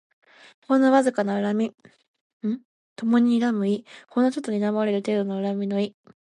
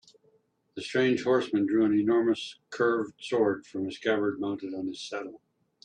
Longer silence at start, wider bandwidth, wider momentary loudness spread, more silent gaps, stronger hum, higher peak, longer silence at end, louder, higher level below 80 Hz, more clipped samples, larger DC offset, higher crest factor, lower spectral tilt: about the same, 0.7 s vs 0.75 s; first, 11 kHz vs 9.8 kHz; about the same, 11 LU vs 13 LU; first, 2.08-2.14 s, 2.21-2.40 s, 2.65-2.96 s vs none; neither; first, -6 dBFS vs -12 dBFS; about the same, 0.4 s vs 0.45 s; first, -24 LUFS vs -28 LUFS; about the same, -76 dBFS vs -72 dBFS; neither; neither; about the same, 18 dB vs 16 dB; about the same, -6.5 dB/octave vs -5.5 dB/octave